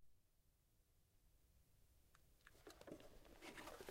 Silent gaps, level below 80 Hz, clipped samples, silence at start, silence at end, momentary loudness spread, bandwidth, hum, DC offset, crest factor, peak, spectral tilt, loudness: none; -74 dBFS; under 0.1%; 0 s; 0 s; 9 LU; 16 kHz; none; under 0.1%; 24 dB; -40 dBFS; -3.5 dB/octave; -61 LUFS